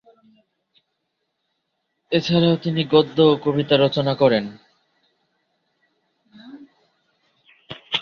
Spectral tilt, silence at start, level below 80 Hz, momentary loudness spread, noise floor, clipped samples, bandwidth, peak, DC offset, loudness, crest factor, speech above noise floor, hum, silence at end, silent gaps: -7 dB/octave; 2.1 s; -60 dBFS; 10 LU; -75 dBFS; under 0.1%; 6.8 kHz; -2 dBFS; under 0.1%; -19 LUFS; 20 dB; 58 dB; none; 0 s; none